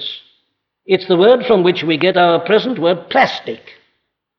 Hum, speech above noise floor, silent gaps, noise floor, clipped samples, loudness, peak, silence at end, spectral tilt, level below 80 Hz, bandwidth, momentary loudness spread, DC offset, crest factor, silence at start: none; 55 dB; none; -68 dBFS; under 0.1%; -14 LUFS; -2 dBFS; 0.7 s; -6.5 dB/octave; -62 dBFS; 6.4 kHz; 15 LU; under 0.1%; 14 dB; 0 s